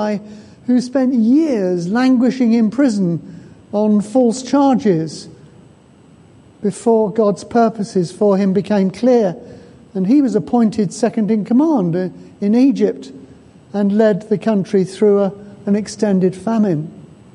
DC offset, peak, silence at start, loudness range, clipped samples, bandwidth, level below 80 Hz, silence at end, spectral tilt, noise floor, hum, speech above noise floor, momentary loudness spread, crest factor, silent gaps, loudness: under 0.1%; -2 dBFS; 0 s; 3 LU; under 0.1%; 11 kHz; -58 dBFS; 0.35 s; -7 dB/octave; -46 dBFS; none; 31 dB; 10 LU; 14 dB; none; -16 LUFS